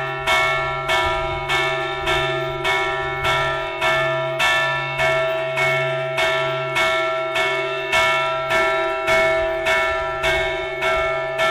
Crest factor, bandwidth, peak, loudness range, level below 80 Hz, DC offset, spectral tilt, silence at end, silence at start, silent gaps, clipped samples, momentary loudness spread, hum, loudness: 12 dB; 15.5 kHz; -8 dBFS; 1 LU; -42 dBFS; under 0.1%; -3.5 dB/octave; 0 s; 0 s; none; under 0.1%; 4 LU; none; -19 LUFS